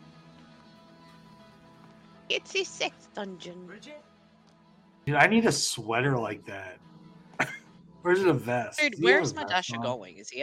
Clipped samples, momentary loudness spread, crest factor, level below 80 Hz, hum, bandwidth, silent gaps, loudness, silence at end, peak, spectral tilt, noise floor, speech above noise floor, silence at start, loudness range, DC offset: under 0.1%; 22 LU; 24 dB; -68 dBFS; none; 15.5 kHz; none; -27 LUFS; 0 s; -6 dBFS; -4 dB/octave; -59 dBFS; 31 dB; 2.3 s; 9 LU; under 0.1%